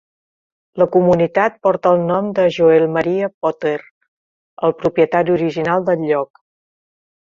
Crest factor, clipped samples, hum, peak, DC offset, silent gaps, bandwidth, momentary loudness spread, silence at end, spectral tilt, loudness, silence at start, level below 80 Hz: 16 dB; under 0.1%; none; -2 dBFS; under 0.1%; 3.34-3.41 s, 3.91-4.01 s, 4.08-4.57 s; 7.2 kHz; 8 LU; 0.95 s; -8 dB/octave; -16 LUFS; 0.75 s; -56 dBFS